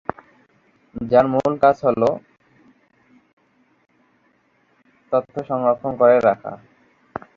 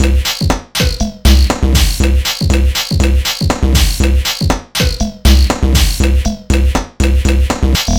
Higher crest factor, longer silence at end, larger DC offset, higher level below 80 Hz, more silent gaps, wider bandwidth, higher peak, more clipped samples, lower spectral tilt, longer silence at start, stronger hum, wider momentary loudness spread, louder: first, 20 dB vs 12 dB; first, 0.8 s vs 0 s; neither; second, -58 dBFS vs -14 dBFS; first, 3.33-3.37 s vs none; second, 7.2 kHz vs over 20 kHz; about the same, -2 dBFS vs 0 dBFS; second, under 0.1% vs 0.2%; first, -8 dB/octave vs -4.5 dB/octave; first, 0.95 s vs 0 s; neither; first, 20 LU vs 4 LU; second, -18 LUFS vs -13 LUFS